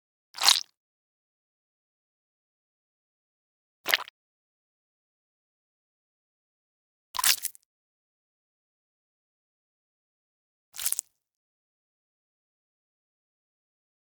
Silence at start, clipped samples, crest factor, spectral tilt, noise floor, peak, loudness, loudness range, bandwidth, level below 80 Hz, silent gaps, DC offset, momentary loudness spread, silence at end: 0.35 s; under 0.1%; 36 dB; 3.5 dB/octave; under -90 dBFS; 0 dBFS; -25 LUFS; 6 LU; over 20 kHz; -80 dBFS; 0.77-3.84 s, 4.10-7.14 s, 7.65-10.72 s; under 0.1%; 23 LU; 3.05 s